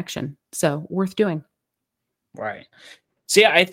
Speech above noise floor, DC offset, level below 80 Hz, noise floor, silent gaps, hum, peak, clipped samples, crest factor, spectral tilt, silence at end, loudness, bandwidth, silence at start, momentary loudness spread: 60 dB; under 0.1%; -64 dBFS; -81 dBFS; none; none; 0 dBFS; under 0.1%; 22 dB; -3.5 dB/octave; 0 s; -21 LUFS; 16.5 kHz; 0 s; 18 LU